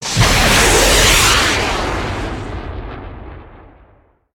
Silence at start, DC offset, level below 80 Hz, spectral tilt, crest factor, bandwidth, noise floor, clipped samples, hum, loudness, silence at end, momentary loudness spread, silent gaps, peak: 0 s; under 0.1%; -24 dBFS; -2.5 dB/octave; 16 dB; 19.5 kHz; -51 dBFS; under 0.1%; none; -12 LUFS; 0.8 s; 20 LU; none; 0 dBFS